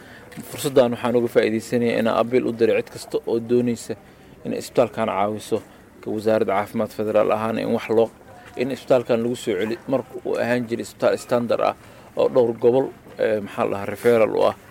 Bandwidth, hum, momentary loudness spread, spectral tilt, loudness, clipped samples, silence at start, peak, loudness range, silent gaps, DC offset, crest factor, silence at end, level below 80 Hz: 17 kHz; none; 11 LU; -6 dB/octave; -22 LUFS; under 0.1%; 0 s; -6 dBFS; 3 LU; none; under 0.1%; 16 dB; 0.15 s; -58 dBFS